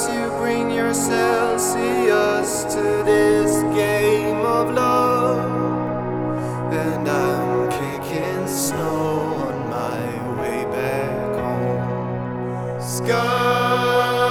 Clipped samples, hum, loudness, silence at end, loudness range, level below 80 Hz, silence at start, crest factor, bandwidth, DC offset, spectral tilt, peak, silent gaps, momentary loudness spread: under 0.1%; none; -20 LUFS; 0 s; 5 LU; -50 dBFS; 0 s; 16 dB; 19 kHz; under 0.1%; -5 dB/octave; -4 dBFS; none; 8 LU